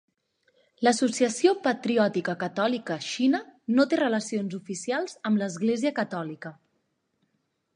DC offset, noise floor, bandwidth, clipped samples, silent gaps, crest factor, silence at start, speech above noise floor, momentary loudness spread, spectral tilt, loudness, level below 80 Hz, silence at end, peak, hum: under 0.1%; -75 dBFS; 11 kHz; under 0.1%; none; 20 dB; 0.8 s; 50 dB; 9 LU; -4.5 dB/octave; -26 LUFS; -78 dBFS; 1.2 s; -8 dBFS; none